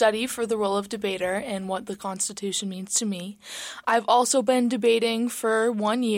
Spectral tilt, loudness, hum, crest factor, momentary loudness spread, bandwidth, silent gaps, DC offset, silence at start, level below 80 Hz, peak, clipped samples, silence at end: -3 dB/octave; -25 LUFS; none; 16 dB; 10 LU; 16.5 kHz; none; under 0.1%; 0 s; -66 dBFS; -10 dBFS; under 0.1%; 0 s